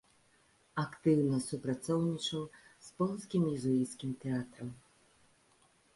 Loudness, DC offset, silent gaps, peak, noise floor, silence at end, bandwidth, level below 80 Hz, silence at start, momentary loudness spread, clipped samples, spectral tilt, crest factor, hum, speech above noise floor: -35 LUFS; under 0.1%; none; -18 dBFS; -69 dBFS; 1.15 s; 11.5 kHz; -72 dBFS; 0.75 s; 16 LU; under 0.1%; -6.5 dB/octave; 18 dB; none; 35 dB